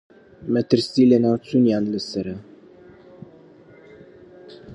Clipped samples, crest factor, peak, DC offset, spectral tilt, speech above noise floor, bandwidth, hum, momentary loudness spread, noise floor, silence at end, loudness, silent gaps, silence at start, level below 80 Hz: under 0.1%; 20 dB; -2 dBFS; under 0.1%; -7 dB/octave; 29 dB; 10.5 kHz; none; 16 LU; -48 dBFS; 0 s; -20 LUFS; none; 0.4 s; -58 dBFS